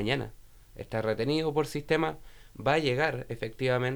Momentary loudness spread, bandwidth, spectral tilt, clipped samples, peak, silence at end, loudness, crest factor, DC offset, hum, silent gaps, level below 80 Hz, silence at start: 10 LU; over 20 kHz; -6 dB/octave; under 0.1%; -10 dBFS; 0 s; -30 LUFS; 20 dB; under 0.1%; none; none; -52 dBFS; 0 s